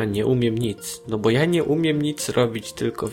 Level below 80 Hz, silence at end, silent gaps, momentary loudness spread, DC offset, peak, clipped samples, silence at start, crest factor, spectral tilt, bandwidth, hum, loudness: -52 dBFS; 0 s; none; 8 LU; under 0.1%; -8 dBFS; under 0.1%; 0 s; 14 dB; -5.5 dB/octave; 16.5 kHz; none; -22 LUFS